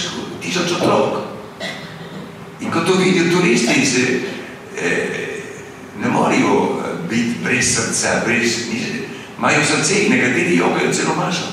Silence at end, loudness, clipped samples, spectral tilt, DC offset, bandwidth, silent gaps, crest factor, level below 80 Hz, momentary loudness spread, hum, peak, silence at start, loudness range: 0 s; -17 LUFS; under 0.1%; -3.5 dB/octave; under 0.1%; 15.5 kHz; none; 14 dB; -54 dBFS; 16 LU; none; -4 dBFS; 0 s; 3 LU